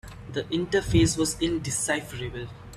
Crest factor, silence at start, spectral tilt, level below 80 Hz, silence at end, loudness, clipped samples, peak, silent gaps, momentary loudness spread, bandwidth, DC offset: 18 dB; 0.05 s; -4.5 dB/octave; -42 dBFS; 0 s; -26 LUFS; under 0.1%; -8 dBFS; none; 13 LU; 14.5 kHz; under 0.1%